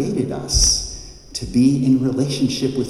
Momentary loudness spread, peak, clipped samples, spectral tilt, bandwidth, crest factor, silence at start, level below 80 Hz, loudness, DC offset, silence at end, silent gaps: 15 LU; -4 dBFS; under 0.1%; -4.5 dB/octave; 12.5 kHz; 16 dB; 0 s; -30 dBFS; -18 LUFS; under 0.1%; 0 s; none